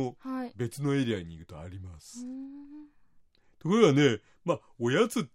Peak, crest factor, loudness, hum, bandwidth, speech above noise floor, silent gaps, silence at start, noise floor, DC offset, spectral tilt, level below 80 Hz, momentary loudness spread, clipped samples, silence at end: -10 dBFS; 20 dB; -28 LUFS; none; 15 kHz; 32 dB; none; 0 s; -61 dBFS; under 0.1%; -6 dB/octave; -66 dBFS; 22 LU; under 0.1%; 0.05 s